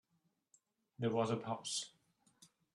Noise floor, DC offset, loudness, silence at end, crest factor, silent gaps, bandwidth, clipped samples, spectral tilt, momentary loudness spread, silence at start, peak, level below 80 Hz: -81 dBFS; under 0.1%; -39 LUFS; 0.3 s; 20 dB; none; 12.5 kHz; under 0.1%; -4.5 dB/octave; 5 LU; 1 s; -22 dBFS; -80 dBFS